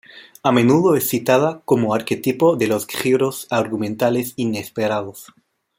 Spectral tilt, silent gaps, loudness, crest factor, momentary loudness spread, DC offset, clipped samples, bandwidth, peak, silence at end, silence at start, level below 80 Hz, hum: -5.5 dB/octave; none; -19 LUFS; 16 dB; 8 LU; under 0.1%; under 0.1%; 16.5 kHz; -2 dBFS; 0.55 s; 0.15 s; -60 dBFS; none